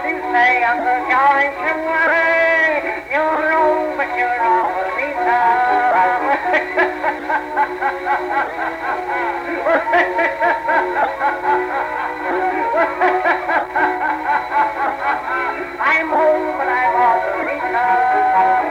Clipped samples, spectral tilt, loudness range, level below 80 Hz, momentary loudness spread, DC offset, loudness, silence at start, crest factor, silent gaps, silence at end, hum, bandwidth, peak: under 0.1%; -4.5 dB/octave; 3 LU; -52 dBFS; 7 LU; under 0.1%; -17 LUFS; 0 s; 12 dB; none; 0 s; none; 15 kHz; -4 dBFS